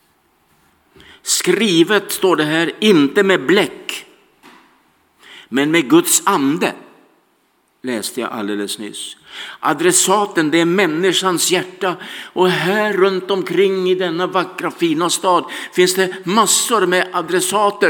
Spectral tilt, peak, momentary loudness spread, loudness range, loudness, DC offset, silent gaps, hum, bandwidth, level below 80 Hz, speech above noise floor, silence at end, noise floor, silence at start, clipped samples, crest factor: -3 dB/octave; 0 dBFS; 11 LU; 3 LU; -15 LUFS; under 0.1%; none; none; 18 kHz; -70 dBFS; 45 dB; 0 s; -60 dBFS; 1.25 s; under 0.1%; 16 dB